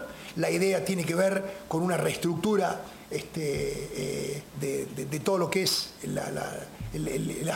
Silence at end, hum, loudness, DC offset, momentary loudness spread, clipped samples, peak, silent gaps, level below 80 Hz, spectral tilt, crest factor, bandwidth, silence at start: 0 s; none; -30 LUFS; under 0.1%; 10 LU; under 0.1%; -10 dBFS; none; -54 dBFS; -4.5 dB/octave; 20 dB; 16.5 kHz; 0 s